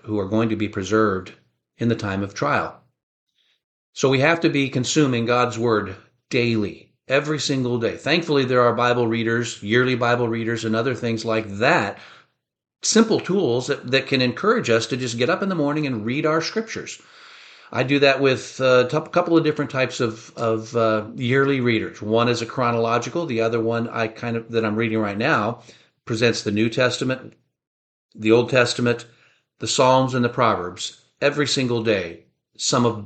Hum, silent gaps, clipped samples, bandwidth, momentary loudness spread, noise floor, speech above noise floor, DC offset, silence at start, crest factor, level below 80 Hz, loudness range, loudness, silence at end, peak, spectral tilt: none; 3.03-3.27 s, 3.64-3.93 s, 27.67-28.09 s; under 0.1%; 9 kHz; 9 LU; -46 dBFS; 25 dB; under 0.1%; 0.05 s; 18 dB; -60 dBFS; 3 LU; -21 LUFS; 0 s; -2 dBFS; -5 dB/octave